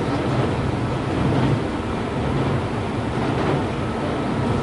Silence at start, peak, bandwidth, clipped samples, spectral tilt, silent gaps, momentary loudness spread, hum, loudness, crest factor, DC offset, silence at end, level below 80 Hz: 0 s; -8 dBFS; 11.5 kHz; under 0.1%; -7.5 dB/octave; none; 4 LU; none; -23 LUFS; 14 dB; under 0.1%; 0 s; -36 dBFS